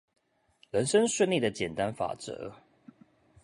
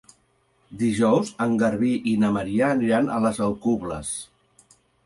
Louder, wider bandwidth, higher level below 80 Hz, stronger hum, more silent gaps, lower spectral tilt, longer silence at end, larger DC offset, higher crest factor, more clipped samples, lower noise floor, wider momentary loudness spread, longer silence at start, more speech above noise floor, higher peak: second, -29 LUFS vs -23 LUFS; about the same, 11.5 kHz vs 11.5 kHz; second, -64 dBFS vs -54 dBFS; neither; neither; second, -4 dB/octave vs -6 dB/octave; about the same, 0.9 s vs 0.8 s; neither; about the same, 18 dB vs 16 dB; neither; about the same, -66 dBFS vs -65 dBFS; first, 15 LU vs 7 LU; about the same, 0.75 s vs 0.7 s; second, 37 dB vs 43 dB; second, -12 dBFS vs -8 dBFS